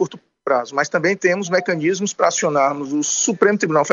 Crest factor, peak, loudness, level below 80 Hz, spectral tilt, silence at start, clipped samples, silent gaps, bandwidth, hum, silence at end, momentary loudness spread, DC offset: 18 dB; -2 dBFS; -18 LUFS; -68 dBFS; -3.5 dB/octave; 0 s; under 0.1%; none; 7.8 kHz; none; 0 s; 5 LU; under 0.1%